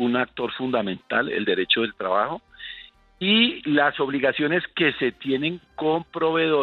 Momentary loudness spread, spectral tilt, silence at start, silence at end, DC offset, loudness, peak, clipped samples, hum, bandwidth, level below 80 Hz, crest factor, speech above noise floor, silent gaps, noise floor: 8 LU; -7.5 dB/octave; 0 s; 0 s; under 0.1%; -23 LUFS; -6 dBFS; under 0.1%; none; 4.8 kHz; -60 dBFS; 18 dB; 22 dB; none; -44 dBFS